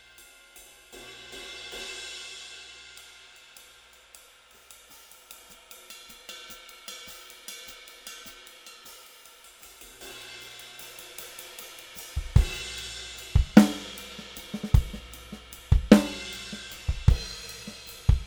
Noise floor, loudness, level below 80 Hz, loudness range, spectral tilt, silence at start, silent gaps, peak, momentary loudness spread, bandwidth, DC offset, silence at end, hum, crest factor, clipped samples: -55 dBFS; -28 LUFS; -34 dBFS; 20 LU; -5.5 dB/octave; 0.95 s; none; 0 dBFS; 23 LU; over 20 kHz; under 0.1%; 0 s; none; 28 dB; under 0.1%